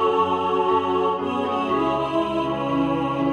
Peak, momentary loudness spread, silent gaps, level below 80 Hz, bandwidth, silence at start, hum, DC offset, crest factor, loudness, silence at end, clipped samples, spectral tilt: -8 dBFS; 3 LU; none; -52 dBFS; 10 kHz; 0 s; none; under 0.1%; 14 dB; -22 LUFS; 0 s; under 0.1%; -7 dB/octave